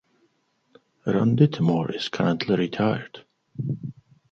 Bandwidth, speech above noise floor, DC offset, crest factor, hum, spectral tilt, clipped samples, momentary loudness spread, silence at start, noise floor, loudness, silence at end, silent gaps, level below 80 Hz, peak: 7.4 kHz; 46 dB; under 0.1%; 20 dB; none; -7.5 dB/octave; under 0.1%; 14 LU; 1.05 s; -69 dBFS; -24 LUFS; 0.4 s; none; -62 dBFS; -6 dBFS